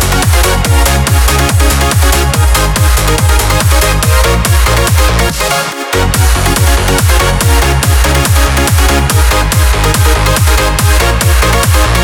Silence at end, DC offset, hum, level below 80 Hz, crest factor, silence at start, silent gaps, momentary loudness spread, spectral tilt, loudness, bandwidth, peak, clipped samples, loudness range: 0 s; under 0.1%; none; -12 dBFS; 8 dB; 0 s; none; 1 LU; -4 dB/octave; -9 LUFS; 18.5 kHz; 0 dBFS; under 0.1%; 1 LU